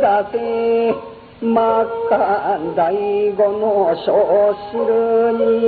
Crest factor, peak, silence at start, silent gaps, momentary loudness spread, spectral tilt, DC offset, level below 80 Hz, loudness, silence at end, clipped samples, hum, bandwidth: 12 dB; -4 dBFS; 0 s; none; 6 LU; -9.5 dB/octave; under 0.1%; -54 dBFS; -17 LUFS; 0 s; under 0.1%; none; 4.7 kHz